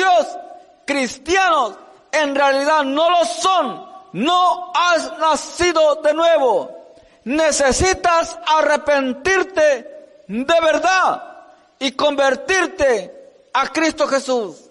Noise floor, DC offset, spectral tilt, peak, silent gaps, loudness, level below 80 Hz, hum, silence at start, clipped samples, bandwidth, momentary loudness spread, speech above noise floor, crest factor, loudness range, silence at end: -44 dBFS; under 0.1%; -2.5 dB/octave; -6 dBFS; none; -17 LUFS; -44 dBFS; none; 0 s; under 0.1%; 11.5 kHz; 9 LU; 27 dB; 12 dB; 2 LU; 0.15 s